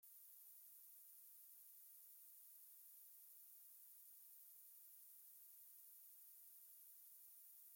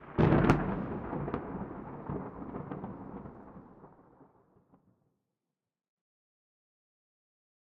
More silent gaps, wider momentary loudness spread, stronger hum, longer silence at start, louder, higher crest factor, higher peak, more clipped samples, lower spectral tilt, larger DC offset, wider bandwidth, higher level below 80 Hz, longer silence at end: neither; second, 0 LU vs 22 LU; neither; about the same, 0 s vs 0 s; second, -61 LUFS vs -33 LUFS; second, 14 dB vs 28 dB; second, -50 dBFS vs -8 dBFS; neither; second, 3 dB/octave vs -7.5 dB/octave; neither; first, 17 kHz vs 7.6 kHz; second, under -90 dBFS vs -50 dBFS; second, 0 s vs 3.5 s